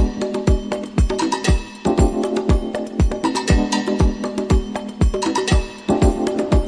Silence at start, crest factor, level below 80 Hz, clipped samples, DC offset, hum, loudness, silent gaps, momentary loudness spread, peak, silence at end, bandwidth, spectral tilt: 0 s; 18 dB; -22 dBFS; under 0.1%; under 0.1%; none; -20 LUFS; none; 4 LU; 0 dBFS; 0 s; 11 kHz; -6 dB/octave